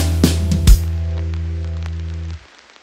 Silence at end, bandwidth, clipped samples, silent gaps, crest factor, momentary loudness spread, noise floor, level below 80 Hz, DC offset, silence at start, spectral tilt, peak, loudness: 0.45 s; 16.5 kHz; under 0.1%; none; 16 dB; 14 LU; -36 dBFS; -20 dBFS; under 0.1%; 0 s; -5.5 dB/octave; 0 dBFS; -19 LUFS